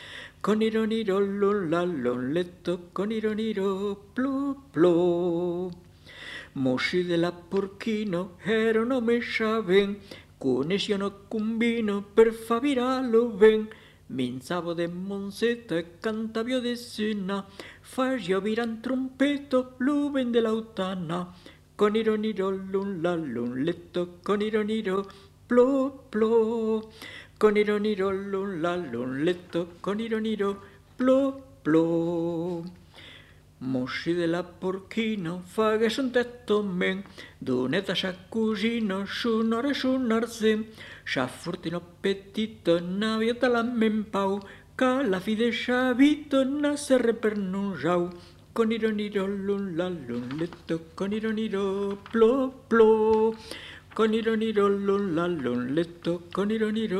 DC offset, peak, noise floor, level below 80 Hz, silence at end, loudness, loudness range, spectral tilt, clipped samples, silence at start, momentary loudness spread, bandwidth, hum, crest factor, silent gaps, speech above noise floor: under 0.1%; -6 dBFS; -52 dBFS; -60 dBFS; 0 s; -27 LUFS; 5 LU; -6 dB/octave; under 0.1%; 0 s; 10 LU; 13 kHz; 50 Hz at -60 dBFS; 20 dB; none; 25 dB